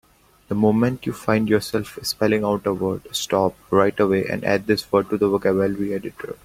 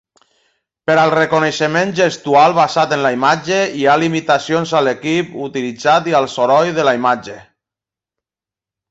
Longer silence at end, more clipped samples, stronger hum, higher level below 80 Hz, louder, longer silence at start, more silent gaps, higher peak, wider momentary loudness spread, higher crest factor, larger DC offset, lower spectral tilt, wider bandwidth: second, 0.1 s vs 1.5 s; neither; neither; first, -52 dBFS vs -58 dBFS; second, -21 LUFS vs -14 LUFS; second, 0.5 s vs 0.9 s; neither; about the same, -2 dBFS vs 0 dBFS; about the same, 8 LU vs 7 LU; about the same, 18 dB vs 14 dB; neither; about the same, -5.5 dB/octave vs -4.5 dB/octave; first, 16.5 kHz vs 8.2 kHz